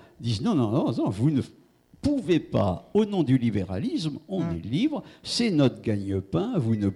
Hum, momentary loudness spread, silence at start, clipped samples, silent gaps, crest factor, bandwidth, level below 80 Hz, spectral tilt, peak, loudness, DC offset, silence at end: none; 7 LU; 0.2 s; under 0.1%; none; 16 dB; 12 kHz; -54 dBFS; -7 dB/octave; -10 dBFS; -26 LUFS; under 0.1%; 0 s